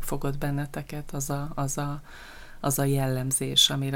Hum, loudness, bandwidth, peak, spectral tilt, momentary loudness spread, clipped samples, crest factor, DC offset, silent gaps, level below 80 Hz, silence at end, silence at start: none; -27 LUFS; 17 kHz; -8 dBFS; -3.5 dB/octave; 18 LU; under 0.1%; 20 dB; under 0.1%; none; -42 dBFS; 0 s; 0 s